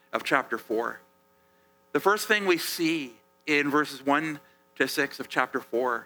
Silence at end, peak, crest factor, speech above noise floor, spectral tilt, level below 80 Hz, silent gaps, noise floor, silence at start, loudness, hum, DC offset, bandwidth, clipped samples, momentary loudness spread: 0 s; -8 dBFS; 22 dB; 37 dB; -3.5 dB/octave; -78 dBFS; none; -64 dBFS; 0.15 s; -27 LUFS; none; under 0.1%; over 20 kHz; under 0.1%; 11 LU